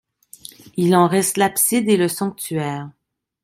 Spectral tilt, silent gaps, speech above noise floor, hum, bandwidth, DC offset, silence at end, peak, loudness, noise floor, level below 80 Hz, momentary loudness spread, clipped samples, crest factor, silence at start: -4.5 dB/octave; none; 25 dB; none; 16.5 kHz; under 0.1%; 0.55 s; -2 dBFS; -18 LUFS; -43 dBFS; -62 dBFS; 23 LU; under 0.1%; 18 dB; 0.75 s